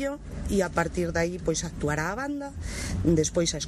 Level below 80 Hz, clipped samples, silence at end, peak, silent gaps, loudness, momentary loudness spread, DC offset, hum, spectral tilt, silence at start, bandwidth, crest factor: -40 dBFS; under 0.1%; 0 s; -8 dBFS; none; -28 LUFS; 10 LU; under 0.1%; none; -4.5 dB/octave; 0 s; 13 kHz; 20 dB